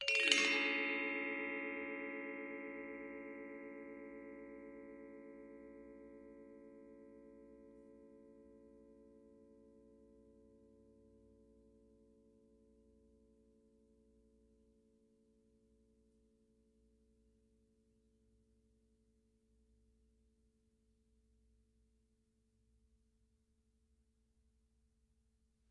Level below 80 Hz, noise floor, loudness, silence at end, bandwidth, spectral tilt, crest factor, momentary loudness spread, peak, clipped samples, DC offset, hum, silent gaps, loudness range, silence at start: -78 dBFS; -79 dBFS; -39 LUFS; 14.1 s; 8.2 kHz; -1 dB/octave; 36 dB; 28 LU; -12 dBFS; under 0.1%; under 0.1%; none; none; 26 LU; 0 s